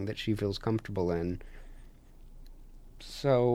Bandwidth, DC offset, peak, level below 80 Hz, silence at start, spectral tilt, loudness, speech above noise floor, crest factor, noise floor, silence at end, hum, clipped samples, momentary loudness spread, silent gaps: 15.5 kHz; under 0.1%; -16 dBFS; -48 dBFS; 0 s; -7 dB/octave; -32 LUFS; 21 dB; 18 dB; -51 dBFS; 0 s; none; under 0.1%; 22 LU; none